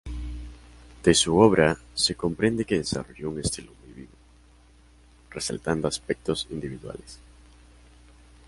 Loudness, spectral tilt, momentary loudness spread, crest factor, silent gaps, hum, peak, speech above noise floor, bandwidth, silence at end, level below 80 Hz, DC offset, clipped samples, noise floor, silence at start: -25 LUFS; -4 dB/octave; 23 LU; 24 dB; none; none; -2 dBFS; 30 dB; 11.5 kHz; 1.3 s; -44 dBFS; under 0.1%; under 0.1%; -55 dBFS; 0.05 s